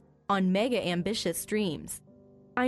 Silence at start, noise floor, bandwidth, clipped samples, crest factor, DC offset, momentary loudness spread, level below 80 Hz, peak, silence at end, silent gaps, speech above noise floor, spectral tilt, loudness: 0.3 s; -56 dBFS; 12 kHz; under 0.1%; 16 dB; under 0.1%; 12 LU; -62 dBFS; -14 dBFS; 0 s; none; 27 dB; -5 dB/octave; -29 LUFS